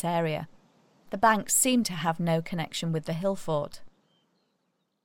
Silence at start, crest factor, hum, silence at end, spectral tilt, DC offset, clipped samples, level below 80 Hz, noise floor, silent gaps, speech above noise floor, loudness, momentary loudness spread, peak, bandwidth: 0 s; 20 dB; none; 1.15 s; -4 dB/octave; under 0.1%; under 0.1%; -60 dBFS; -76 dBFS; none; 49 dB; -27 LUFS; 13 LU; -8 dBFS; 17 kHz